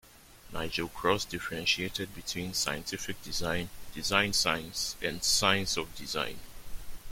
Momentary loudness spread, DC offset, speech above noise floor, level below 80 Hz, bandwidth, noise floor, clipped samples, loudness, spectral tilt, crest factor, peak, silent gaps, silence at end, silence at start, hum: 15 LU; under 0.1%; 20 dB; -50 dBFS; 16.5 kHz; -52 dBFS; under 0.1%; -30 LUFS; -2 dB/octave; 24 dB; -8 dBFS; none; 0 s; 0.05 s; none